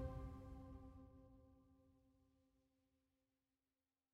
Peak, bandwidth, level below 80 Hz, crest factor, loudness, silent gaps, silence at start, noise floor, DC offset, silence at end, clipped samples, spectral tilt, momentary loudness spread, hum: -36 dBFS; 13 kHz; -64 dBFS; 22 dB; -58 LUFS; none; 0 s; under -90 dBFS; under 0.1%; 1.75 s; under 0.1%; -8.5 dB/octave; 14 LU; none